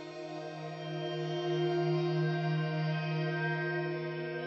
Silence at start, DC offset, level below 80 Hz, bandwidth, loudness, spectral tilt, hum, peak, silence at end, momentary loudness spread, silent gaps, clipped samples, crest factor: 0 s; under 0.1%; -82 dBFS; 7 kHz; -34 LUFS; -7.5 dB/octave; none; -22 dBFS; 0 s; 10 LU; none; under 0.1%; 12 dB